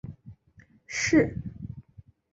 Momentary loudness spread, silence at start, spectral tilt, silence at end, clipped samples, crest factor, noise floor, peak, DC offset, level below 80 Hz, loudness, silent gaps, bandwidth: 21 LU; 0.05 s; -5 dB/octave; 0.55 s; under 0.1%; 20 dB; -58 dBFS; -10 dBFS; under 0.1%; -52 dBFS; -26 LUFS; none; 8 kHz